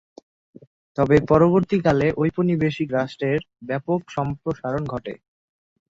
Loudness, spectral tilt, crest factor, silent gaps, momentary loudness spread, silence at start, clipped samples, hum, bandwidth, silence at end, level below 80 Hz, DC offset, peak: -22 LUFS; -8.5 dB/octave; 20 dB; none; 13 LU; 0.95 s; under 0.1%; none; 7.6 kHz; 0.8 s; -48 dBFS; under 0.1%; -2 dBFS